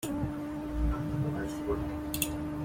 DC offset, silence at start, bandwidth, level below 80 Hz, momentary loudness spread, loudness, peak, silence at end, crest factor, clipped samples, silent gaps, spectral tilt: under 0.1%; 0 s; 16.5 kHz; -40 dBFS; 3 LU; -34 LUFS; -10 dBFS; 0 s; 24 dB; under 0.1%; none; -5.5 dB/octave